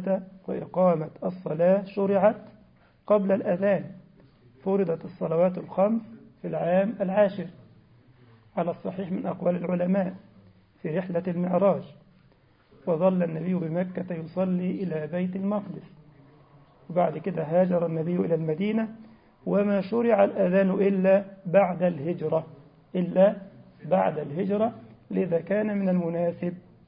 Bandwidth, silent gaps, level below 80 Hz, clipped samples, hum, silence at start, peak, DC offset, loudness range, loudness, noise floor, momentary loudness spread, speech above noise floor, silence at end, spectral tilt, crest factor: 5.2 kHz; none; -68 dBFS; under 0.1%; none; 0 s; -8 dBFS; under 0.1%; 6 LU; -26 LUFS; -60 dBFS; 12 LU; 35 dB; 0.25 s; -12.5 dB/octave; 18 dB